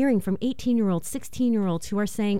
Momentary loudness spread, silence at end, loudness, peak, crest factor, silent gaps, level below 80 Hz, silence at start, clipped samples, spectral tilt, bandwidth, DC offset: 5 LU; 0 s; -26 LUFS; -14 dBFS; 12 dB; none; -52 dBFS; 0 s; under 0.1%; -6.5 dB/octave; 16 kHz; 2%